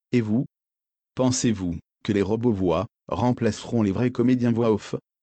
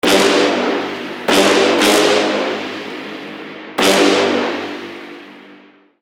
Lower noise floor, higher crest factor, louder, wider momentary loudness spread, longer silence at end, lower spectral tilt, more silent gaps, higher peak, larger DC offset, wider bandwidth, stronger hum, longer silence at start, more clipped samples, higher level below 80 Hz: first, under -90 dBFS vs -45 dBFS; about the same, 14 dB vs 16 dB; second, -24 LUFS vs -14 LUFS; second, 10 LU vs 18 LU; second, 0.25 s vs 0.45 s; first, -6 dB/octave vs -2.5 dB/octave; neither; second, -10 dBFS vs 0 dBFS; neither; second, 9 kHz vs 16.5 kHz; neither; about the same, 0.1 s vs 0.05 s; neither; about the same, -52 dBFS vs -56 dBFS